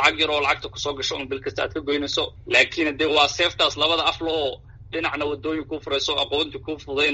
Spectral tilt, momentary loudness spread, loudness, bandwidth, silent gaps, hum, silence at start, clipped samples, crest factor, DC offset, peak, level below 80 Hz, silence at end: -0.5 dB/octave; 10 LU; -22 LUFS; 8 kHz; none; none; 0 s; under 0.1%; 22 dB; under 0.1%; -2 dBFS; -48 dBFS; 0 s